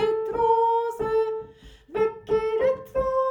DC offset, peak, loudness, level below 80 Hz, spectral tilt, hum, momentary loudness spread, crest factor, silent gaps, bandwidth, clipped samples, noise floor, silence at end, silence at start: under 0.1%; -10 dBFS; -24 LUFS; -50 dBFS; -6 dB/octave; none; 9 LU; 14 dB; none; 16.5 kHz; under 0.1%; -48 dBFS; 0 s; 0 s